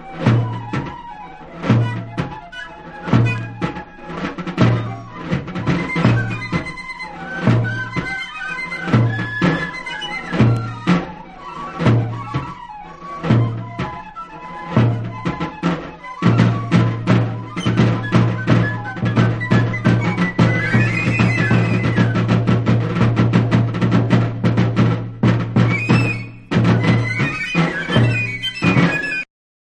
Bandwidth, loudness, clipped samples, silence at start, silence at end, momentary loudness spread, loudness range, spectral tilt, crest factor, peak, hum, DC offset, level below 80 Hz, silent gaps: 8.6 kHz; -18 LUFS; under 0.1%; 0 s; 0.4 s; 13 LU; 6 LU; -7.5 dB/octave; 16 dB; -2 dBFS; none; under 0.1%; -40 dBFS; none